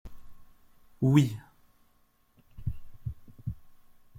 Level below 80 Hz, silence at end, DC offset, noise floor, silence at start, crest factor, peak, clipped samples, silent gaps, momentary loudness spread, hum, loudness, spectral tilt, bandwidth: -50 dBFS; 0 s; under 0.1%; -66 dBFS; 0.05 s; 24 dB; -8 dBFS; under 0.1%; none; 19 LU; none; -31 LUFS; -7.5 dB/octave; 16 kHz